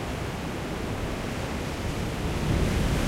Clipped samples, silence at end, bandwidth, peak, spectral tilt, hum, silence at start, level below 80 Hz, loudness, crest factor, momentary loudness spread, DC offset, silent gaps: under 0.1%; 0 s; 16 kHz; -12 dBFS; -5.5 dB/octave; none; 0 s; -34 dBFS; -30 LUFS; 16 dB; 6 LU; under 0.1%; none